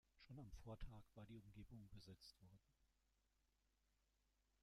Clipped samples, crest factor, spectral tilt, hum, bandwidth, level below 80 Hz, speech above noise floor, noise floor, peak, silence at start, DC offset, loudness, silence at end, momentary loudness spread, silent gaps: under 0.1%; 20 dB; -6 dB/octave; none; 13.5 kHz; -68 dBFS; 25 dB; -86 dBFS; -42 dBFS; 0.15 s; under 0.1%; -63 LUFS; 1.7 s; 5 LU; none